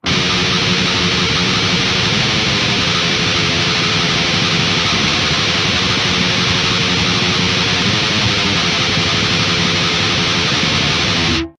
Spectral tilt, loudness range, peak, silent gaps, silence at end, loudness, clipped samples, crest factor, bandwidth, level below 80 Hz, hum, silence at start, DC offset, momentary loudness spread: -3 dB/octave; 0 LU; -2 dBFS; none; 0.1 s; -13 LUFS; under 0.1%; 14 dB; 10.5 kHz; -36 dBFS; none; 0.05 s; under 0.1%; 0 LU